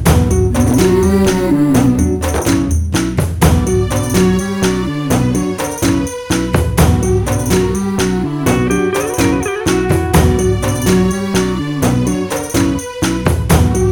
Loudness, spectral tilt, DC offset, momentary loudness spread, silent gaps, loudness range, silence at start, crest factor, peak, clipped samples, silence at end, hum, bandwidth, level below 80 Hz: -14 LUFS; -5.5 dB/octave; under 0.1%; 5 LU; none; 2 LU; 0 s; 12 dB; 0 dBFS; under 0.1%; 0 s; none; 19.5 kHz; -24 dBFS